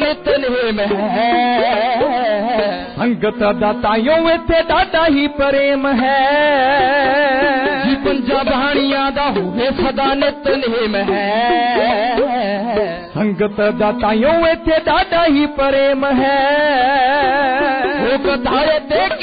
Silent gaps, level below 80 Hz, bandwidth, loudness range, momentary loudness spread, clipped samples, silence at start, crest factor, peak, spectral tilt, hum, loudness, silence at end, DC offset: none; -38 dBFS; 5 kHz; 2 LU; 4 LU; under 0.1%; 0 s; 10 dB; -4 dBFS; -2.5 dB/octave; none; -15 LUFS; 0 s; 0.1%